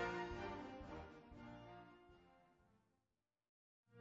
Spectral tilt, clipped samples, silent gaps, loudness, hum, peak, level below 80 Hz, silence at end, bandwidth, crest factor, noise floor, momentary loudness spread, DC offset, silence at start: -4 dB/octave; under 0.1%; 3.49-3.84 s; -52 LUFS; none; -32 dBFS; -68 dBFS; 0 s; 7.6 kHz; 22 dB; under -90 dBFS; 19 LU; under 0.1%; 0 s